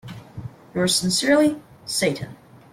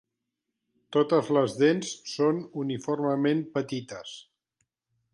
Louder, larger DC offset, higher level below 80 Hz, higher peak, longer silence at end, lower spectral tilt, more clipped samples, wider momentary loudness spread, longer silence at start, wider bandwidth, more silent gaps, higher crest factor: first, -21 LUFS vs -27 LUFS; neither; first, -56 dBFS vs -74 dBFS; first, -6 dBFS vs -10 dBFS; second, 0.4 s vs 0.95 s; second, -3.5 dB/octave vs -5.5 dB/octave; neither; first, 20 LU vs 14 LU; second, 0.05 s vs 0.9 s; first, 16 kHz vs 11.5 kHz; neither; about the same, 18 dB vs 18 dB